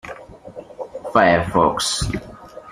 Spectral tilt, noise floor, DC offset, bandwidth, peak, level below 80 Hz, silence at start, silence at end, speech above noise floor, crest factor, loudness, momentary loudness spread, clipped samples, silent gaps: -4 dB/octave; -38 dBFS; under 0.1%; 15.5 kHz; -2 dBFS; -40 dBFS; 0.05 s; 0 s; 21 dB; 20 dB; -18 LUFS; 23 LU; under 0.1%; none